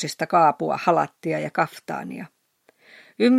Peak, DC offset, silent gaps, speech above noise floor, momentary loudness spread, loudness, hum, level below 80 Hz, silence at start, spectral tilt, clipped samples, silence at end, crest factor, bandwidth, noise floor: -4 dBFS; under 0.1%; none; 39 dB; 16 LU; -23 LUFS; none; -76 dBFS; 0 s; -5.5 dB/octave; under 0.1%; 0 s; 18 dB; 15 kHz; -62 dBFS